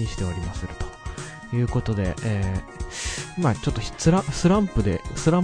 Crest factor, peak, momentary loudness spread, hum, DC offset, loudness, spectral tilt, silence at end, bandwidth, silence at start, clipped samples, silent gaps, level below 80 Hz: 20 dB; -4 dBFS; 13 LU; none; under 0.1%; -25 LUFS; -6 dB/octave; 0 s; 10.5 kHz; 0 s; under 0.1%; none; -36 dBFS